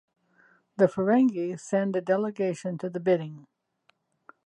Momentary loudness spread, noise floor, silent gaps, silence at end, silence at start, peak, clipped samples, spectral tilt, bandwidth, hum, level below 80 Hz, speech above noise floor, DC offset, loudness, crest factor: 10 LU; -69 dBFS; none; 1.05 s; 0.8 s; -8 dBFS; under 0.1%; -7.5 dB/octave; 10.5 kHz; none; -74 dBFS; 44 dB; under 0.1%; -26 LUFS; 20 dB